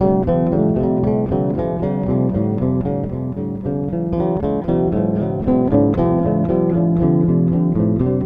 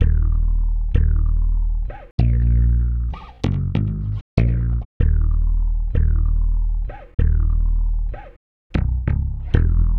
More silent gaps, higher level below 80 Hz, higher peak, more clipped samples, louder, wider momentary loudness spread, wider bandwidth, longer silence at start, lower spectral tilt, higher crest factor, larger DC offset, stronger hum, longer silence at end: second, none vs 2.11-2.18 s, 4.21-4.37 s, 4.85-5.00 s, 7.14-7.18 s, 8.36-8.70 s; second, -34 dBFS vs -18 dBFS; about the same, -2 dBFS vs 0 dBFS; neither; first, -18 LUFS vs -22 LUFS; about the same, 6 LU vs 8 LU; second, 3.7 kHz vs 4.3 kHz; about the same, 0 s vs 0 s; first, -12.5 dB/octave vs -9.5 dB/octave; about the same, 14 dB vs 18 dB; neither; neither; about the same, 0 s vs 0 s